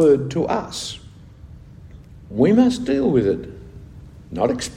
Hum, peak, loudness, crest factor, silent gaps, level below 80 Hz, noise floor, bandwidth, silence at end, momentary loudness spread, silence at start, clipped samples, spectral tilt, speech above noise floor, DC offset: none; -4 dBFS; -20 LUFS; 16 dB; none; -44 dBFS; -42 dBFS; 12.5 kHz; 0 s; 22 LU; 0 s; under 0.1%; -6 dB/octave; 24 dB; under 0.1%